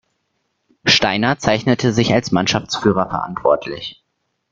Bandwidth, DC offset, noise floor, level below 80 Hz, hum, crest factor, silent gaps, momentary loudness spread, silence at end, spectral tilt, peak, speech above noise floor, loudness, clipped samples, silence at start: 7.8 kHz; under 0.1%; -71 dBFS; -48 dBFS; none; 18 dB; none; 8 LU; 0.6 s; -4.5 dB/octave; 0 dBFS; 54 dB; -17 LUFS; under 0.1%; 0.85 s